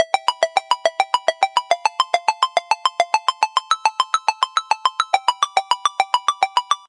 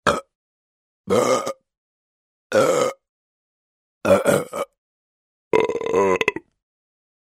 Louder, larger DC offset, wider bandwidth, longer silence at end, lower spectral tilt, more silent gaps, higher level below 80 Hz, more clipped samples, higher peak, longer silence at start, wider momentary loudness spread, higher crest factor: about the same, -19 LUFS vs -21 LUFS; neither; second, 11.5 kHz vs 16 kHz; second, 0.15 s vs 0.9 s; second, 2.5 dB/octave vs -4.5 dB/octave; second, none vs 0.35-1.04 s, 1.78-2.50 s, 3.09-4.01 s, 4.78-5.51 s; second, -88 dBFS vs -58 dBFS; neither; about the same, 0 dBFS vs -2 dBFS; about the same, 0 s vs 0.05 s; second, 2 LU vs 13 LU; about the same, 20 dB vs 22 dB